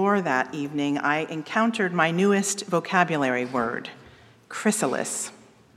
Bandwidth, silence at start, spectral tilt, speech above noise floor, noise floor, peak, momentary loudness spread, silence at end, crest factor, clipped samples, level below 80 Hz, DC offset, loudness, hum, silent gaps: 15.5 kHz; 0 s; -4 dB/octave; 27 dB; -51 dBFS; -4 dBFS; 8 LU; 0.4 s; 20 dB; under 0.1%; -68 dBFS; under 0.1%; -24 LUFS; none; none